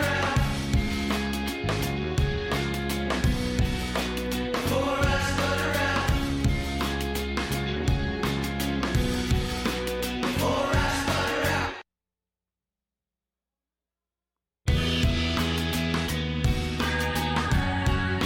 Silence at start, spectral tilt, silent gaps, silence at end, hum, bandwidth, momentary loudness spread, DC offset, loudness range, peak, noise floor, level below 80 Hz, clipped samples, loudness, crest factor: 0 s; -5 dB/octave; none; 0 s; none; 17 kHz; 4 LU; under 0.1%; 5 LU; -12 dBFS; under -90 dBFS; -34 dBFS; under 0.1%; -27 LUFS; 14 dB